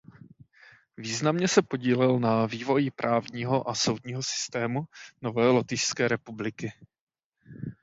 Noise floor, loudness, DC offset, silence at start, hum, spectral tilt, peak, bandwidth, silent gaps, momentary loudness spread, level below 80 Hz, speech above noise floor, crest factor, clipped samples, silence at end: -57 dBFS; -27 LUFS; under 0.1%; 1 s; none; -4.5 dB/octave; -4 dBFS; 8 kHz; 7.01-7.07 s, 7.24-7.32 s; 13 LU; -66 dBFS; 30 dB; 24 dB; under 0.1%; 0.1 s